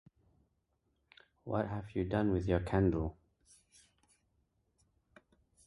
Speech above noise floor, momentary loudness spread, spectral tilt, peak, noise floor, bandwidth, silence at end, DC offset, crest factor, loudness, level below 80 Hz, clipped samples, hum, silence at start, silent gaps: 46 dB; 8 LU; -8.5 dB/octave; -16 dBFS; -79 dBFS; 11.5 kHz; 2.55 s; under 0.1%; 22 dB; -35 LUFS; -52 dBFS; under 0.1%; none; 1.45 s; none